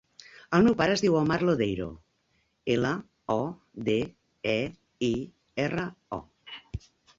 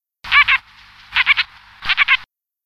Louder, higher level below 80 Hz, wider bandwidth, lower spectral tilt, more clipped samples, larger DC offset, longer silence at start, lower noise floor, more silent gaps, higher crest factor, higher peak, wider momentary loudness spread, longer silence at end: second, -28 LUFS vs -15 LUFS; second, -54 dBFS vs -48 dBFS; second, 7.8 kHz vs 14 kHz; first, -6 dB/octave vs 0 dB/octave; neither; neither; first, 0.5 s vs 0.25 s; first, -72 dBFS vs -45 dBFS; neither; about the same, 20 dB vs 16 dB; second, -8 dBFS vs -2 dBFS; first, 16 LU vs 10 LU; about the same, 0.4 s vs 0.4 s